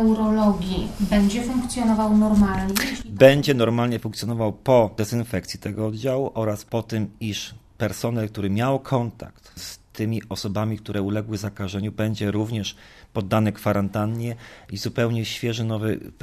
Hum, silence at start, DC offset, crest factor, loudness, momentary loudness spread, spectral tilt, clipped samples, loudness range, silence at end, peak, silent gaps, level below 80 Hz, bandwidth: none; 0 s; under 0.1%; 22 dB; -23 LUFS; 12 LU; -6 dB/octave; under 0.1%; 8 LU; 0.15 s; 0 dBFS; none; -42 dBFS; 14 kHz